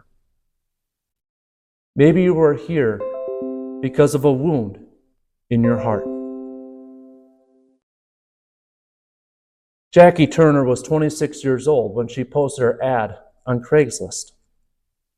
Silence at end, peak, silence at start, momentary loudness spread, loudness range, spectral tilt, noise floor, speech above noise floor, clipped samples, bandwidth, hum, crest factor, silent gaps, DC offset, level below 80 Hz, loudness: 0.95 s; 0 dBFS; 1.95 s; 16 LU; 9 LU; -6.5 dB/octave; -78 dBFS; 62 dB; under 0.1%; 15 kHz; none; 20 dB; 7.83-9.91 s; under 0.1%; -52 dBFS; -18 LUFS